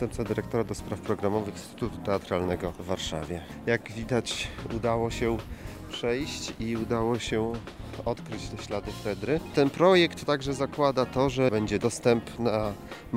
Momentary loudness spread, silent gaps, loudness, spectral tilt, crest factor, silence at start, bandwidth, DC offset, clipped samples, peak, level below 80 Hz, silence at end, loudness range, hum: 10 LU; none; -29 LUFS; -5.5 dB/octave; 20 dB; 0 s; 16 kHz; under 0.1%; under 0.1%; -8 dBFS; -46 dBFS; 0 s; 6 LU; none